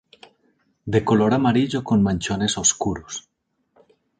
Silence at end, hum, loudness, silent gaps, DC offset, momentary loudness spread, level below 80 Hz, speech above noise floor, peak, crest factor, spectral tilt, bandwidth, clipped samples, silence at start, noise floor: 1 s; none; -20 LUFS; none; under 0.1%; 14 LU; -48 dBFS; 45 dB; -4 dBFS; 18 dB; -4.5 dB/octave; 9.6 kHz; under 0.1%; 0.85 s; -65 dBFS